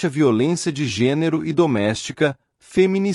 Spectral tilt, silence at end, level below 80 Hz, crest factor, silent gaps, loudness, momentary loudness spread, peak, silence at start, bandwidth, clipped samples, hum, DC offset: -6 dB/octave; 0 s; -56 dBFS; 14 dB; none; -20 LUFS; 5 LU; -4 dBFS; 0 s; 12 kHz; under 0.1%; none; under 0.1%